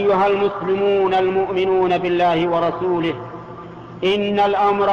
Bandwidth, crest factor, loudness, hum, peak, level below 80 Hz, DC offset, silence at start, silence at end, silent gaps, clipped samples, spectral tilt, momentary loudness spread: 6.8 kHz; 10 dB; -18 LUFS; none; -8 dBFS; -52 dBFS; under 0.1%; 0 s; 0 s; none; under 0.1%; -7 dB/octave; 15 LU